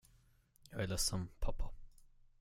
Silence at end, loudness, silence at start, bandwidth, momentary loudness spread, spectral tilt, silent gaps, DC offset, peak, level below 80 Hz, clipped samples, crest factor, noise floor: 0.5 s; -41 LUFS; 0.7 s; 16 kHz; 14 LU; -3.5 dB/octave; none; under 0.1%; -24 dBFS; -46 dBFS; under 0.1%; 18 dB; -69 dBFS